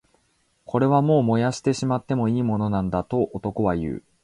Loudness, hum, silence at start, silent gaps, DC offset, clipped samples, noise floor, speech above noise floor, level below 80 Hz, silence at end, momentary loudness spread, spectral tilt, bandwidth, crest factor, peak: -23 LUFS; none; 0.7 s; none; under 0.1%; under 0.1%; -66 dBFS; 45 dB; -48 dBFS; 0.25 s; 7 LU; -7.5 dB/octave; 11 kHz; 16 dB; -8 dBFS